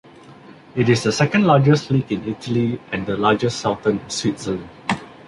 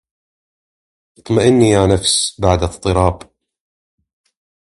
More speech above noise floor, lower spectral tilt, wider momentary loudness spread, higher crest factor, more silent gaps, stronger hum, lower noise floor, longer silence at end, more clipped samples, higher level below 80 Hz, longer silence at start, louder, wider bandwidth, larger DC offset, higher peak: second, 25 dB vs over 76 dB; about the same, -6 dB/octave vs -5 dB/octave; first, 11 LU vs 7 LU; about the same, 18 dB vs 18 dB; neither; neither; second, -43 dBFS vs under -90 dBFS; second, 0.15 s vs 1.5 s; neither; second, -50 dBFS vs -32 dBFS; second, 0.3 s vs 1.25 s; second, -20 LUFS vs -14 LUFS; about the same, 11.5 kHz vs 11.5 kHz; neither; about the same, -2 dBFS vs 0 dBFS